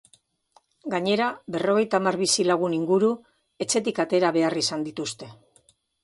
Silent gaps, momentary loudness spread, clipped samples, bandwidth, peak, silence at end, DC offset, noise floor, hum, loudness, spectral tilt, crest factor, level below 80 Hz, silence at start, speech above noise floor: none; 12 LU; under 0.1%; 11.5 kHz; -6 dBFS; 0.7 s; under 0.1%; -63 dBFS; none; -24 LUFS; -3.5 dB/octave; 18 dB; -70 dBFS; 0.85 s; 39 dB